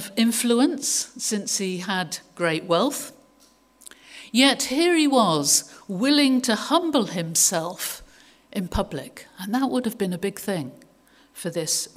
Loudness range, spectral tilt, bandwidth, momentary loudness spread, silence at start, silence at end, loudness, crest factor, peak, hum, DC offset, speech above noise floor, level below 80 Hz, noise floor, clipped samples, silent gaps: 8 LU; -3 dB/octave; 16 kHz; 15 LU; 0 s; 0.1 s; -22 LUFS; 20 dB; -4 dBFS; none; under 0.1%; 35 dB; -50 dBFS; -58 dBFS; under 0.1%; none